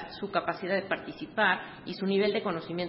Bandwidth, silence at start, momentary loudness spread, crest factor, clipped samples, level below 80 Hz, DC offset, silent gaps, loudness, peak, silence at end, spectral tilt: 5.8 kHz; 0 s; 8 LU; 20 dB; under 0.1%; -66 dBFS; under 0.1%; none; -30 LUFS; -12 dBFS; 0 s; -9.5 dB/octave